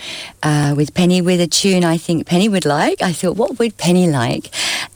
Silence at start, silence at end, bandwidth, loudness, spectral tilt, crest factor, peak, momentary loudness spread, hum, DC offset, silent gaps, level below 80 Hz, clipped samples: 0 s; 0.1 s; over 20 kHz; -15 LUFS; -5 dB/octave; 12 dB; -4 dBFS; 5 LU; none; under 0.1%; none; -50 dBFS; under 0.1%